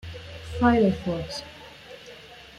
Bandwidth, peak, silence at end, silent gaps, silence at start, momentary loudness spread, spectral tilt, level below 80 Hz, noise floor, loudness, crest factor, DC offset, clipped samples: 12 kHz; -6 dBFS; 0 s; none; 0.05 s; 23 LU; -6.5 dB/octave; -48 dBFS; -46 dBFS; -24 LUFS; 20 dB; under 0.1%; under 0.1%